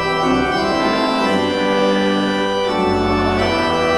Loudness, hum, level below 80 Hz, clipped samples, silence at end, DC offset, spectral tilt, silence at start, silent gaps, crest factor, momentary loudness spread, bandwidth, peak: -17 LUFS; none; -38 dBFS; under 0.1%; 0 s; under 0.1%; -5 dB/octave; 0 s; none; 12 dB; 2 LU; 13.5 kHz; -4 dBFS